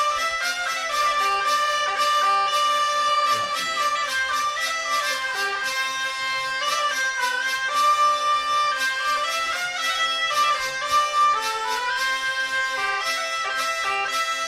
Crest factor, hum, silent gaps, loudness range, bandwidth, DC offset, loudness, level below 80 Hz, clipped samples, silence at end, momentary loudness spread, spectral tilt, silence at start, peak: 12 dB; none; none; 2 LU; 16 kHz; under 0.1%; -22 LUFS; -60 dBFS; under 0.1%; 0 s; 5 LU; 1.5 dB/octave; 0 s; -10 dBFS